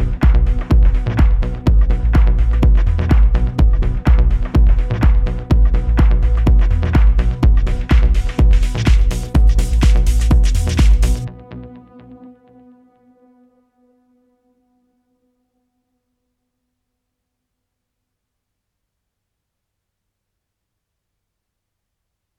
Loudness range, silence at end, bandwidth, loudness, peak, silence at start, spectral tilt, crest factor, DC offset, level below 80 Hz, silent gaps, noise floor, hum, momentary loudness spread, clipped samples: 4 LU; 10.25 s; 9.6 kHz; -16 LUFS; -2 dBFS; 0 s; -7 dB/octave; 14 dB; under 0.1%; -16 dBFS; none; -77 dBFS; none; 3 LU; under 0.1%